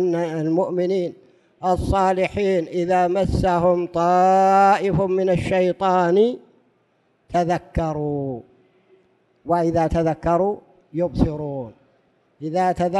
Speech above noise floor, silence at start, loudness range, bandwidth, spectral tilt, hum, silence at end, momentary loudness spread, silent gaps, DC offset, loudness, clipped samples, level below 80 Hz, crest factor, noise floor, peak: 45 dB; 0 s; 6 LU; 12 kHz; -7.5 dB/octave; none; 0 s; 13 LU; none; under 0.1%; -20 LUFS; under 0.1%; -38 dBFS; 16 dB; -64 dBFS; -4 dBFS